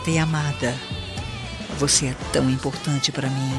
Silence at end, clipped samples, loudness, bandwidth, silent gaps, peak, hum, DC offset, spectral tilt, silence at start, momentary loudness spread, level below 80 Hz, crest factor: 0 s; under 0.1%; -23 LUFS; 12.5 kHz; none; -4 dBFS; none; under 0.1%; -4 dB/octave; 0 s; 12 LU; -42 dBFS; 18 dB